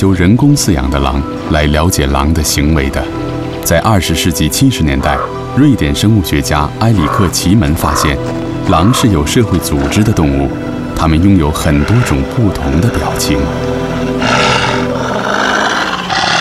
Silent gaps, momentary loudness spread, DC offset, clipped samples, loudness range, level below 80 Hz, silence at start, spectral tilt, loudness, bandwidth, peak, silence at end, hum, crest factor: none; 6 LU; under 0.1%; under 0.1%; 1 LU; -24 dBFS; 0 s; -5 dB/octave; -12 LUFS; 15.5 kHz; 0 dBFS; 0 s; none; 10 dB